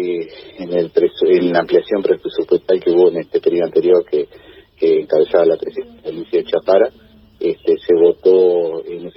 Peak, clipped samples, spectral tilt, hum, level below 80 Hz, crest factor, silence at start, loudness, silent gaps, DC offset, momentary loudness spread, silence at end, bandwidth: 0 dBFS; under 0.1%; -9.5 dB/octave; none; -56 dBFS; 14 dB; 0 s; -15 LUFS; none; under 0.1%; 12 LU; 0.05 s; 5.8 kHz